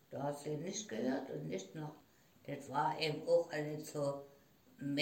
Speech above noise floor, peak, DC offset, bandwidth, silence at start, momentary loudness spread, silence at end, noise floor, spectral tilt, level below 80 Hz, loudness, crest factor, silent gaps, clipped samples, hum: 21 dB; -20 dBFS; under 0.1%; 16.5 kHz; 0.1 s; 14 LU; 0 s; -61 dBFS; -5 dB/octave; -82 dBFS; -40 LUFS; 20 dB; none; under 0.1%; none